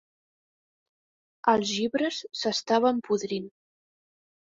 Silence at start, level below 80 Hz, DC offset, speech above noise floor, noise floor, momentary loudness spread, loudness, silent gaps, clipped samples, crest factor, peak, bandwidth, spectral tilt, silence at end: 1.45 s; -70 dBFS; under 0.1%; over 64 dB; under -90 dBFS; 9 LU; -27 LUFS; none; under 0.1%; 22 dB; -8 dBFS; 7.8 kHz; -4 dB/octave; 1.1 s